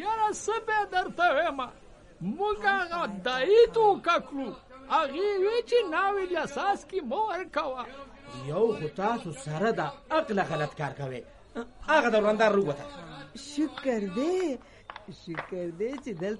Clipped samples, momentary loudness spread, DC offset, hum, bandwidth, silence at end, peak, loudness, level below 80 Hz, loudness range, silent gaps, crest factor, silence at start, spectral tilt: under 0.1%; 18 LU; under 0.1%; none; 11.5 kHz; 0 s; -10 dBFS; -28 LUFS; -58 dBFS; 5 LU; none; 18 dB; 0 s; -5 dB/octave